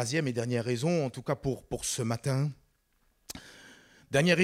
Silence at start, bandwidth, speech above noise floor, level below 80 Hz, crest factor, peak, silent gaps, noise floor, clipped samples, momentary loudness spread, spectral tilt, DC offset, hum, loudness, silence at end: 0 s; 16 kHz; 42 dB; -58 dBFS; 18 dB; -12 dBFS; none; -71 dBFS; under 0.1%; 16 LU; -5 dB/octave; under 0.1%; none; -31 LUFS; 0 s